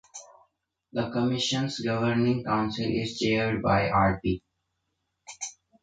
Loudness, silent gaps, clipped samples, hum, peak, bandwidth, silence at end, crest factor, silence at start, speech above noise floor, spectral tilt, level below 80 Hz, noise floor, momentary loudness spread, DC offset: -27 LUFS; none; under 0.1%; none; -12 dBFS; 9.4 kHz; 0.3 s; 16 dB; 0.15 s; 53 dB; -5 dB/octave; -50 dBFS; -79 dBFS; 14 LU; under 0.1%